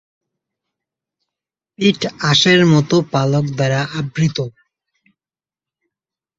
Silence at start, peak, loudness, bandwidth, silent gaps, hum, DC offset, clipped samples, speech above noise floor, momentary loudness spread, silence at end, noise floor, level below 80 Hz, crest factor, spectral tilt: 1.8 s; -2 dBFS; -15 LUFS; 7.8 kHz; none; none; under 0.1%; under 0.1%; over 75 dB; 9 LU; 1.9 s; under -90 dBFS; -54 dBFS; 18 dB; -5 dB/octave